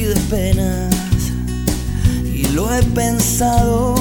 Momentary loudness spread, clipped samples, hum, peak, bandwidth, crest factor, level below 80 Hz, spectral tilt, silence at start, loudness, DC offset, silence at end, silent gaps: 5 LU; under 0.1%; none; -2 dBFS; 17.5 kHz; 14 dB; -22 dBFS; -5.5 dB/octave; 0 s; -17 LUFS; under 0.1%; 0 s; none